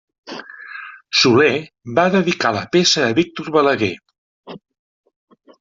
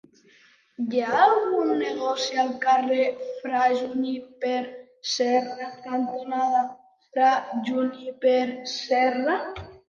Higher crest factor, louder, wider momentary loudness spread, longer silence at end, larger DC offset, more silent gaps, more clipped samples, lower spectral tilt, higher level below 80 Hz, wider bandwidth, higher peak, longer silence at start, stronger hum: about the same, 18 dB vs 20 dB; first, -16 LUFS vs -24 LUFS; first, 20 LU vs 11 LU; first, 1.05 s vs 0.1 s; neither; first, 4.18-4.43 s vs none; neither; about the same, -4 dB/octave vs -3.5 dB/octave; first, -58 dBFS vs -64 dBFS; about the same, 7.8 kHz vs 7.4 kHz; first, 0 dBFS vs -6 dBFS; second, 0.25 s vs 0.8 s; neither